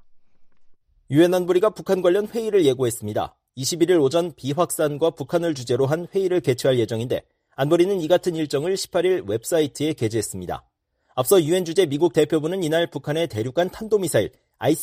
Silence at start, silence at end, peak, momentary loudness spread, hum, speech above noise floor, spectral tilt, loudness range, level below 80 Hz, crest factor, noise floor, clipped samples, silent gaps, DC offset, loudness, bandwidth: 0.15 s; 0 s; -6 dBFS; 8 LU; none; 28 dB; -5.5 dB/octave; 2 LU; -58 dBFS; 16 dB; -49 dBFS; under 0.1%; none; under 0.1%; -22 LUFS; 15.5 kHz